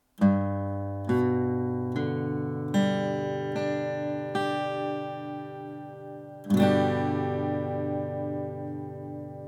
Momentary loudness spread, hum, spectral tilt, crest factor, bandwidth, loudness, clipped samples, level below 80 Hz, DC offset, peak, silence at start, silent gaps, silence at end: 14 LU; none; -7.5 dB/octave; 18 dB; 15.5 kHz; -29 LUFS; under 0.1%; -70 dBFS; under 0.1%; -10 dBFS; 0.2 s; none; 0 s